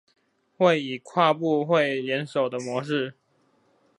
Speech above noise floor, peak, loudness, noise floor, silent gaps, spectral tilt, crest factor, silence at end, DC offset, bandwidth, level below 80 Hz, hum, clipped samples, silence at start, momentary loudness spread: 42 dB; -6 dBFS; -24 LUFS; -66 dBFS; none; -6 dB/octave; 20 dB; 0.85 s; under 0.1%; 11 kHz; -76 dBFS; none; under 0.1%; 0.6 s; 7 LU